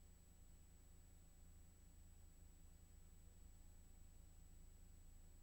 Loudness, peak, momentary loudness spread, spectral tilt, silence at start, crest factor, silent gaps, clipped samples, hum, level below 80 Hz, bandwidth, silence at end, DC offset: -68 LUFS; -52 dBFS; 1 LU; -4.5 dB/octave; 0 s; 12 dB; none; under 0.1%; none; -64 dBFS; 19.5 kHz; 0 s; under 0.1%